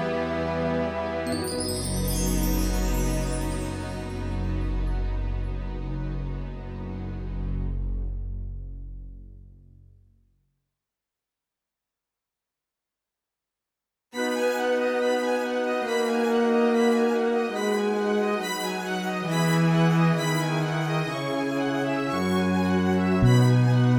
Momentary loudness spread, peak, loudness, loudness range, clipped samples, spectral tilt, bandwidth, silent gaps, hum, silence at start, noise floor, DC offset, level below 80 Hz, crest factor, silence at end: 13 LU; -8 dBFS; -26 LUFS; 12 LU; under 0.1%; -6 dB/octave; over 20 kHz; none; none; 0 s; -88 dBFS; under 0.1%; -34 dBFS; 16 dB; 0 s